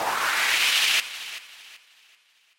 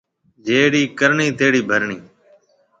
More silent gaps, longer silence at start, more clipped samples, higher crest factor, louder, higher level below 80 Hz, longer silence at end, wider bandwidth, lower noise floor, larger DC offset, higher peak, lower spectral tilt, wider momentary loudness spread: neither; second, 0 s vs 0.45 s; neither; about the same, 18 dB vs 18 dB; second, -21 LUFS vs -16 LUFS; second, -70 dBFS vs -60 dBFS; about the same, 0.8 s vs 0.8 s; first, 16.5 kHz vs 8.8 kHz; first, -61 dBFS vs -55 dBFS; neither; second, -10 dBFS vs 0 dBFS; second, 2 dB/octave vs -4.5 dB/octave; first, 19 LU vs 12 LU